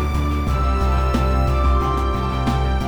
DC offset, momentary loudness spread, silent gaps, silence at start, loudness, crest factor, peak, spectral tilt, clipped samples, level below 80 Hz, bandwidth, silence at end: under 0.1%; 3 LU; none; 0 s; -20 LUFS; 12 dB; -6 dBFS; -7 dB/octave; under 0.1%; -20 dBFS; 9.8 kHz; 0 s